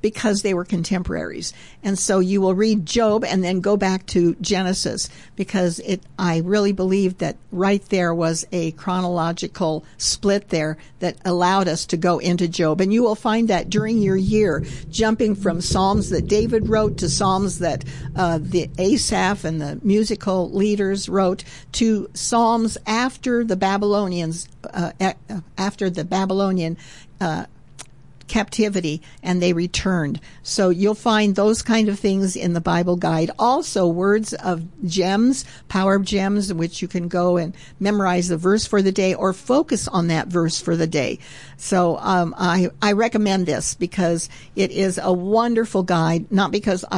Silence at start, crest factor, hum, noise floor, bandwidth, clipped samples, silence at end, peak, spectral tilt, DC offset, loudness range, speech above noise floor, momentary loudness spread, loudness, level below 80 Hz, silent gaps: 0.05 s; 12 dB; none; -43 dBFS; 11.5 kHz; under 0.1%; 0 s; -8 dBFS; -5 dB/octave; 0.4%; 3 LU; 24 dB; 8 LU; -20 LUFS; -42 dBFS; none